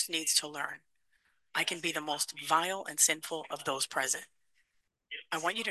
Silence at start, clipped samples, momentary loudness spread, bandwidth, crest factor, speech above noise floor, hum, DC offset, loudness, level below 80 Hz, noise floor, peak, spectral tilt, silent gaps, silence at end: 0 s; under 0.1%; 12 LU; 13 kHz; 24 dB; 44 dB; none; under 0.1%; -31 LUFS; -84 dBFS; -77 dBFS; -12 dBFS; 0 dB/octave; none; 0 s